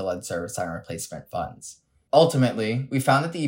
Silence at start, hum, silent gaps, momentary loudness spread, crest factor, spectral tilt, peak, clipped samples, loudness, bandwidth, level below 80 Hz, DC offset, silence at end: 0 s; none; none; 15 LU; 20 dB; -5.5 dB/octave; -4 dBFS; under 0.1%; -24 LUFS; 16.5 kHz; -60 dBFS; under 0.1%; 0 s